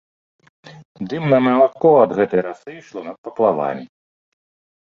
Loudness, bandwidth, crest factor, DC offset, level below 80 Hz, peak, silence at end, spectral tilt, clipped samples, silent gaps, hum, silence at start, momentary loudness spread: -16 LUFS; 7 kHz; 18 dB; under 0.1%; -64 dBFS; -2 dBFS; 1.1 s; -8.5 dB/octave; under 0.1%; 0.85-0.95 s, 3.18-3.24 s; none; 0.65 s; 19 LU